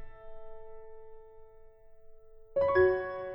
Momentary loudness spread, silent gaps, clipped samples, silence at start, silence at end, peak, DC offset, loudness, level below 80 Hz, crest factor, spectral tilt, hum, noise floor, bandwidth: 27 LU; none; under 0.1%; 0 s; 0 s; -14 dBFS; under 0.1%; -28 LUFS; -54 dBFS; 20 dB; -9 dB/octave; none; -53 dBFS; 5.6 kHz